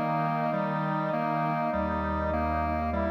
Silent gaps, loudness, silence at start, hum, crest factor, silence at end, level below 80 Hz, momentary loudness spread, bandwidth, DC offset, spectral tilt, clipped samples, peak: none; -29 LUFS; 0 s; none; 10 dB; 0 s; -42 dBFS; 1 LU; 14.5 kHz; under 0.1%; -9 dB/octave; under 0.1%; -18 dBFS